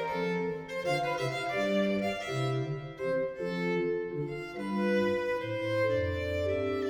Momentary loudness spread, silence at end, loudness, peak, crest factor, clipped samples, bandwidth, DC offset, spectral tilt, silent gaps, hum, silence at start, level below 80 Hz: 6 LU; 0 s; -32 LUFS; -16 dBFS; 14 dB; under 0.1%; 18.5 kHz; under 0.1%; -6.5 dB/octave; none; none; 0 s; -58 dBFS